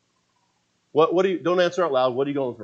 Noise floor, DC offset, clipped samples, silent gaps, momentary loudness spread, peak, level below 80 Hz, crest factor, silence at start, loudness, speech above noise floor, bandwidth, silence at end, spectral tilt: -69 dBFS; under 0.1%; under 0.1%; none; 5 LU; -6 dBFS; -78 dBFS; 16 dB; 0.95 s; -22 LUFS; 48 dB; 7.6 kHz; 0 s; -6 dB/octave